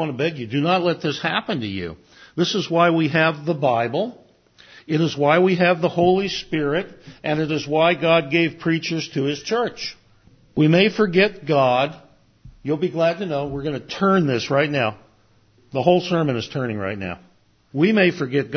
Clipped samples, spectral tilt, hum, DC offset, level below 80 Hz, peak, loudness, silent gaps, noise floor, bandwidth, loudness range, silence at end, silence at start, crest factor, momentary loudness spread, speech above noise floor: under 0.1%; -6 dB/octave; none; under 0.1%; -54 dBFS; -2 dBFS; -20 LUFS; none; -57 dBFS; 6.6 kHz; 3 LU; 0 s; 0 s; 20 dB; 11 LU; 37 dB